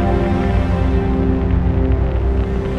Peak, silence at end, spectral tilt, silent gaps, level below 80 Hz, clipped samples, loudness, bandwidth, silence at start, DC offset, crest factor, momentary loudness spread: -4 dBFS; 0 s; -9.5 dB/octave; none; -18 dBFS; under 0.1%; -17 LUFS; 5.8 kHz; 0 s; under 0.1%; 10 dB; 2 LU